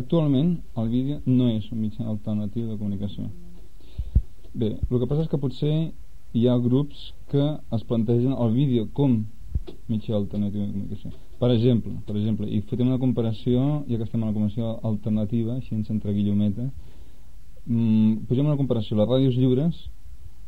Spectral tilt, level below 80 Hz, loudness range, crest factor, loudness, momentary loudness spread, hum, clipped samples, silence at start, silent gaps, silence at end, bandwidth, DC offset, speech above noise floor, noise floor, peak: -10 dB/octave; -40 dBFS; 4 LU; 16 dB; -25 LUFS; 12 LU; none; under 0.1%; 0 s; none; 0 s; 5.2 kHz; 2%; 24 dB; -47 dBFS; -8 dBFS